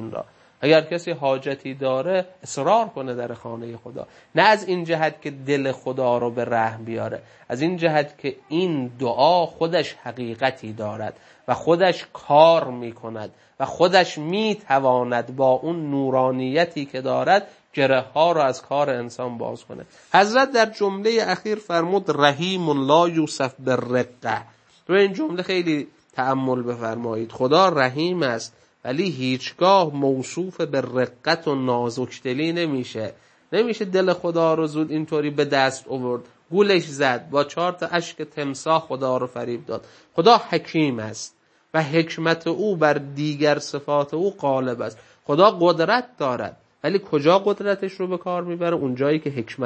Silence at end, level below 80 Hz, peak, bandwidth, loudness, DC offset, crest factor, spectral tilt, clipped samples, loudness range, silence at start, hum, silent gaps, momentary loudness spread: 0 s; -68 dBFS; 0 dBFS; 8.8 kHz; -22 LUFS; under 0.1%; 22 dB; -5.5 dB/octave; under 0.1%; 3 LU; 0 s; none; none; 14 LU